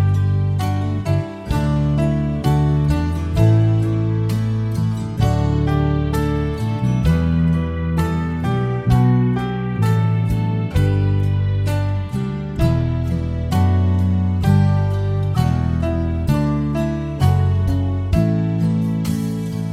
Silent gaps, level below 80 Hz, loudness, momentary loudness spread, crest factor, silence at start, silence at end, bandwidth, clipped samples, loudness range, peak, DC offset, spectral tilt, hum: none; -30 dBFS; -19 LUFS; 5 LU; 14 dB; 0 s; 0 s; 14.5 kHz; under 0.1%; 1 LU; -2 dBFS; under 0.1%; -8.5 dB/octave; none